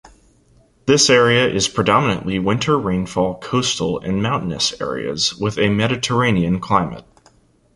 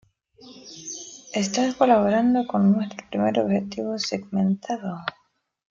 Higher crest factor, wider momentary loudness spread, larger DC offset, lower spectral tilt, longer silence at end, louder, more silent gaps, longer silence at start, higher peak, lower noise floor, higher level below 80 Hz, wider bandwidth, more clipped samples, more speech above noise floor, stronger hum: about the same, 18 dB vs 18 dB; second, 8 LU vs 16 LU; neither; second, -4 dB/octave vs -5.5 dB/octave; about the same, 0.75 s vs 0.7 s; first, -17 LUFS vs -23 LUFS; neither; first, 0.85 s vs 0.45 s; first, -2 dBFS vs -6 dBFS; first, -54 dBFS vs -50 dBFS; first, -44 dBFS vs -62 dBFS; first, 11.5 kHz vs 7.6 kHz; neither; first, 37 dB vs 28 dB; neither